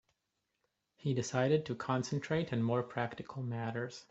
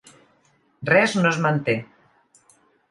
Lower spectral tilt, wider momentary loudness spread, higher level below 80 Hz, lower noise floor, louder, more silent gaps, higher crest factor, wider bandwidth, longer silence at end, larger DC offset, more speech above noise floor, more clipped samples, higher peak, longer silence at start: about the same, -6 dB/octave vs -5.5 dB/octave; about the same, 9 LU vs 10 LU; about the same, -70 dBFS vs -66 dBFS; first, -85 dBFS vs -62 dBFS; second, -36 LUFS vs -20 LUFS; neither; about the same, 18 dB vs 22 dB; second, 8.2 kHz vs 11.5 kHz; second, 0.05 s vs 1.05 s; neither; first, 50 dB vs 43 dB; neither; second, -18 dBFS vs -4 dBFS; first, 1.05 s vs 0.8 s